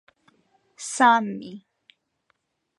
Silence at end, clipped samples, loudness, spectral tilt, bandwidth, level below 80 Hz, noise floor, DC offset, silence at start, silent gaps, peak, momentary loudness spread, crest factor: 1.2 s; under 0.1%; -21 LUFS; -3 dB/octave; 11.5 kHz; -80 dBFS; -72 dBFS; under 0.1%; 0.8 s; none; -4 dBFS; 19 LU; 22 dB